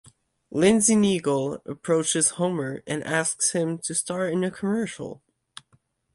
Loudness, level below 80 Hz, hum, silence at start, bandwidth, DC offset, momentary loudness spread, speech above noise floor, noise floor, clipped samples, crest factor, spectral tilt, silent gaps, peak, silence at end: -24 LUFS; -62 dBFS; none; 0.5 s; 11.5 kHz; under 0.1%; 13 LU; 41 dB; -65 dBFS; under 0.1%; 18 dB; -4 dB/octave; none; -6 dBFS; 1 s